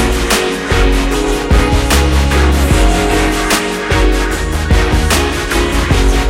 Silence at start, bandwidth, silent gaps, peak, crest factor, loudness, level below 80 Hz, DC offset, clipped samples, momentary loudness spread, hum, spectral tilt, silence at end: 0 s; 16.5 kHz; none; 0 dBFS; 10 dB; -13 LUFS; -14 dBFS; under 0.1%; under 0.1%; 3 LU; none; -4.5 dB/octave; 0 s